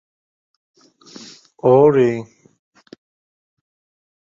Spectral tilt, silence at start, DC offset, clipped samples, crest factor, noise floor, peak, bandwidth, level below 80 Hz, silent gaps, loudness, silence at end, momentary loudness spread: -8 dB/octave; 1.65 s; under 0.1%; under 0.1%; 20 dB; -43 dBFS; -2 dBFS; 7.6 kHz; -62 dBFS; none; -15 LUFS; 2 s; 27 LU